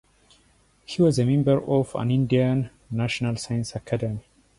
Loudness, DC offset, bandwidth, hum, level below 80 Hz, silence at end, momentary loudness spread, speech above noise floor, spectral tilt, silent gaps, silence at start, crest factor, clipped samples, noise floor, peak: -24 LUFS; under 0.1%; 11.5 kHz; none; -52 dBFS; 0.4 s; 10 LU; 38 dB; -7 dB/octave; none; 0.9 s; 16 dB; under 0.1%; -61 dBFS; -8 dBFS